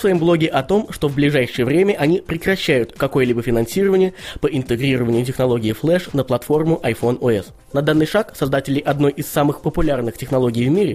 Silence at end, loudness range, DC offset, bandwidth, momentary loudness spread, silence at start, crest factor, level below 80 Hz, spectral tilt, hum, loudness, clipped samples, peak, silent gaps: 0 s; 2 LU; under 0.1%; 15.5 kHz; 5 LU; 0 s; 16 dB; -38 dBFS; -6.5 dB/octave; none; -18 LUFS; under 0.1%; -2 dBFS; none